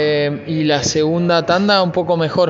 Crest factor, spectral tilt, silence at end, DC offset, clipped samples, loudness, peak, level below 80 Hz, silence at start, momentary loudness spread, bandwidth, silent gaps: 14 dB; -4 dB/octave; 0 s; under 0.1%; under 0.1%; -16 LUFS; 0 dBFS; -50 dBFS; 0 s; 5 LU; 8 kHz; none